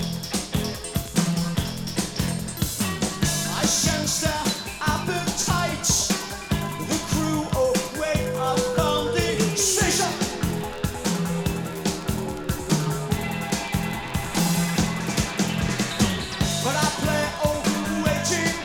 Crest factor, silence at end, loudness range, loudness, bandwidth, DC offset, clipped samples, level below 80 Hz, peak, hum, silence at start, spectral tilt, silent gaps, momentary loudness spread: 16 dB; 0 s; 4 LU; -24 LUFS; 19.5 kHz; under 0.1%; under 0.1%; -40 dBFS; -8 dBFS; none; 0 s; -4 dB/octave; none; 7 LU